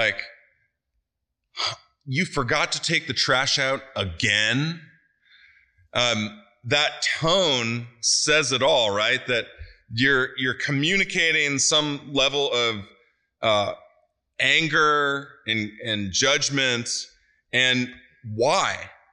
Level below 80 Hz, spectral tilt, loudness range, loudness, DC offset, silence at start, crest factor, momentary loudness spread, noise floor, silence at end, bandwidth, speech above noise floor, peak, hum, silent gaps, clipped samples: -54 dBFS; -2.5 dB/octave; 3 LU; -22 LUFS; under 0.1%; 0 s; 20 dB; 13 LU; -81 dBFS; 0.25 s; 11.5 kHz; 58 dB; -6 dBFS; none; none; under 0.1%